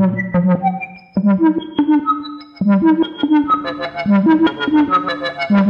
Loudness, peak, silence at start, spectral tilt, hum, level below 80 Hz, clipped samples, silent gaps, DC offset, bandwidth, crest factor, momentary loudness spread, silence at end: -16 LUFS; -2 dBFS; 0 s; -9 dB/octave; none; -52 dBFS; under 0.1%; none; under 0.1%; 5.6 kHz; 12 dB; 8 LU; 0 s